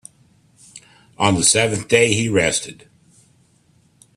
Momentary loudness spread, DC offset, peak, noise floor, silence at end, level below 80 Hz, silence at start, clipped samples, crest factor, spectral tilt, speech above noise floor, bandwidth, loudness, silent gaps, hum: 7 LU; under 0.1%; 0 dBFS; -57 dBFS; 1.45 s; -54 dBFS; 0.75 s; under 0.1%; 20 dB; -3 dB/octave; 40 dB; 13.5 kHz; -16 LUFS; none; none